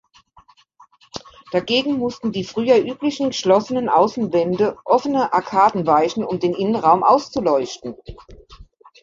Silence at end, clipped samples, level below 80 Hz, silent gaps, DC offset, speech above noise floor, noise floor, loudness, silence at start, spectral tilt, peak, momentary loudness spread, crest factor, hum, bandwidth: 0.4 s; under 0.1%; -52 dBFS; none; under 0.1%; 34 dB; -53 dBFS; -18 LUFS; 1.15 s; -5.5 dB/octave; -2 dBFS; 13 LU; 18 dB; none; 7.6 kHz